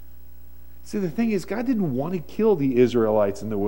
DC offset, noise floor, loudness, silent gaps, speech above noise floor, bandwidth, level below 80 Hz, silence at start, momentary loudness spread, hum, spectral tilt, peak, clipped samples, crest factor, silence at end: 1%; -48 dBFS; -23 LUFS; none; 26 dB; 16.5 kHz; -50 dBFS; 0.85 s; 9 LU; none; -7.5 dB/octave; -6 dBFS; under 0.1%; 18 dB; 0 s